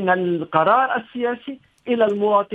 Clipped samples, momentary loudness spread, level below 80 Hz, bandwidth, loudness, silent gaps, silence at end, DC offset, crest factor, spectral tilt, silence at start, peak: under 0.1%; 14 LU; -66 dBFS; 7.4 kHz; -20 LUFS; none; 0 s; under 0.1%; 20 dB; -8 dB/octave; 0 s; 0 dBFS